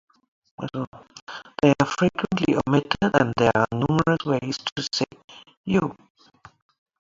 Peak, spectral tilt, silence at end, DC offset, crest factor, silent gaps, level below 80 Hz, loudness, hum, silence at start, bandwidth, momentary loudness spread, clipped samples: -2 dBFS; -6 dB/octave; 1.1 s; under 0.1%; 22 dB; 0.87-0.92 s, 1.22-1.27 s, 4.72-4.76 s, 5.24-5.28 s, 5.57-5.64 s; -52 dBFS; -23 LUFS; none; 0.6 s; 7.8 kHz; 16 LU; under 0.1%